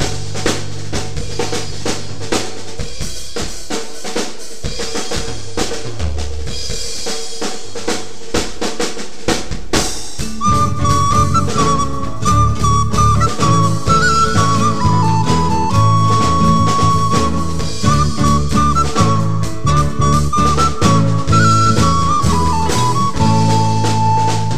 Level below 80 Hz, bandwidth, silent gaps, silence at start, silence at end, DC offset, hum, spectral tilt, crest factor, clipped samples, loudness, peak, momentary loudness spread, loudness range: -28 dBFS; 15 kHz; none; 0 s; 0 s; 10%; none; -5 dB/octave; 16 dB; under 0.1%; -16 LUFS; 0 dBFS; 11 LU; 9 LU